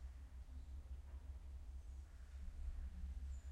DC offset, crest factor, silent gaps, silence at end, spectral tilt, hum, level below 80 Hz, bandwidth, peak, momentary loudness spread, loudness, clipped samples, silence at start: under 0.1%; 14 dB; none; 0 s; -6.5 dB/octave; none; -52 dBFS; 10 kHz; -36 dBFS; 5 LU; -55 LUFS; under 0.1%; 0 s